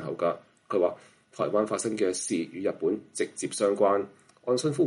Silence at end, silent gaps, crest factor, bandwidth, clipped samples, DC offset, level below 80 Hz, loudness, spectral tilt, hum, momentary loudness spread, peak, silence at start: 0 s; none; 18 dB; 11.5 kHz; under 0.1%; under 0.1%; -76 dBFS; -28 LUFS; -4.5 dB/octave; none; 8 LU; -10 dBFS; 0 s